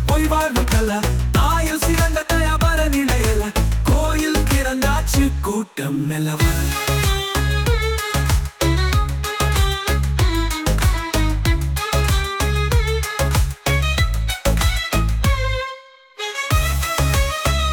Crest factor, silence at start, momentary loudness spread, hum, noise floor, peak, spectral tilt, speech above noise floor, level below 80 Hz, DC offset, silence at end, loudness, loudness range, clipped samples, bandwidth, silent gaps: 14 dB; 0 s; 4 LU; none; -38 dBFS; -4 dBFS; -4.5 dB/octave; 20 dB; -22 dBFS; under 0.1%; 0 s; -19 LUFS; 2 LU; under 0.1%; 19.5 kHz; none